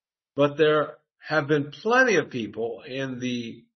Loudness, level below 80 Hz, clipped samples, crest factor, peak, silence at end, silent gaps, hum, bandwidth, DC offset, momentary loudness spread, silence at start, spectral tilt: -24 LUFS; -72 dBFS; under 0.1%; 18 dB; -8 dBFS; 0.15 s; none; none; 6.4 kHz; under 0.1%; 13 LU; 0.35 s; -5 dB/octave